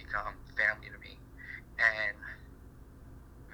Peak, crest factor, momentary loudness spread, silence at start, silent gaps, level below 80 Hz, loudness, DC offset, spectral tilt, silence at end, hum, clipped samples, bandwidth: -12 dBFS; 24 dB; 26 LU; 0 s; none; -54 dBFS; -31 LUFS; under 0.1%; -4 dB/octave; 0 s; none; under 0.1%; over 20 kHz